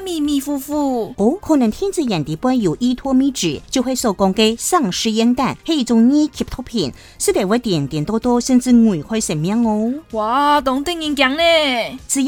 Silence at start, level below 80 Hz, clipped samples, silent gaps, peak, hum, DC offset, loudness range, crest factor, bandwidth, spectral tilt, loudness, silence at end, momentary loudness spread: 0 s; -42 dBFS; under 0.1%; none; 0 dBFS; none; under 0.1%; 2 LU; 16 dB; 18 kHz; -4.5 dB/octave; -17 LUFS; 0 s; 8 LU